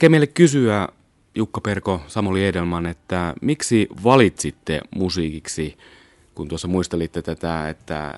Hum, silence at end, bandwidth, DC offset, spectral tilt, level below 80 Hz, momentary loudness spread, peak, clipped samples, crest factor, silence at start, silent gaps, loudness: none; 0 s; 11.5 kHz; under 0.1%; -5.5 dB/octave; -48 dBFS; 13 LU; 0 dBFS; under 0.1%; 20 dB; 0 s; none; -21 LUFS